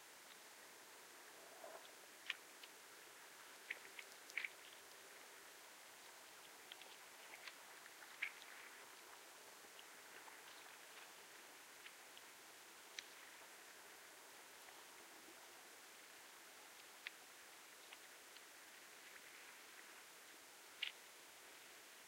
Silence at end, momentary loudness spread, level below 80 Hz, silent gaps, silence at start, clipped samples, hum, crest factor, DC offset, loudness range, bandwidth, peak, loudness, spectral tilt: 0 s; 9 LU; under -90 dBFS; none; 0 s; under 0.1%; none; 32 dB; under 0.1%; 4 LU; 16 kHz; -26 dBFS; -56 LUFS; 0.5 dB/octave